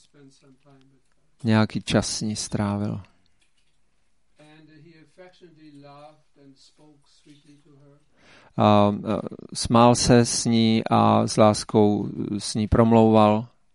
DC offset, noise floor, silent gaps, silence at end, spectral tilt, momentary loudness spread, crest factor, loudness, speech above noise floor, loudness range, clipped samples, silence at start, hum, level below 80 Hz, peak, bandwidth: under 0.1%; -70 dBFS; none; 0.3 s; -5.5 dB/octave; 12 LU; 20 dB; -21 LUFS; 48 dB; 12 LU; under 0.1%; 1.45 s; none; -46 dBFS; -2 dBFS; 11.5 kHz